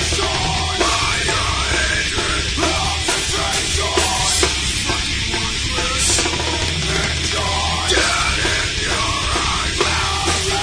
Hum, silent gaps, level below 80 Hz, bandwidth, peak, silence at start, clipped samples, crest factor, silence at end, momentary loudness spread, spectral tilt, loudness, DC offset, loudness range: none; none; -28 dBFS; 11 kHz; 0 dBFS; 0 s; under 0.1%; 18 dB; 0 s; 4 LU; -2 dB/octave; -17 LUFS; under 0.1%; 0 LU